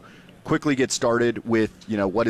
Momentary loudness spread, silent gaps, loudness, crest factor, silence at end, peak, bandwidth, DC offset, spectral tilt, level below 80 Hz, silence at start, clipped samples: 5 LU; none; -23 LUFS; 12 dB; 0 s; -10 dBFS; 13.5 kHz; under 0.1%; -5 dB/octave; -54 dBFS; 0.05 s; under 0.1%